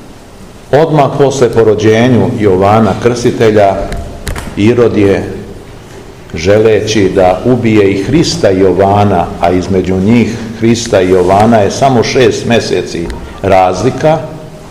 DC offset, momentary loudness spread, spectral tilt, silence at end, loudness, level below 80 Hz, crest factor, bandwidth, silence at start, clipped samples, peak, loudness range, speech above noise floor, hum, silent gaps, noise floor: 1%; 11 LU; -6 dB/octave; 0 s; -9 LUFS; -30 dBFS; 8 dB; 15 kHz; 0 s; 3%; 0 dBFS; 3 LU; 24 dB; none; none; -31 dBFS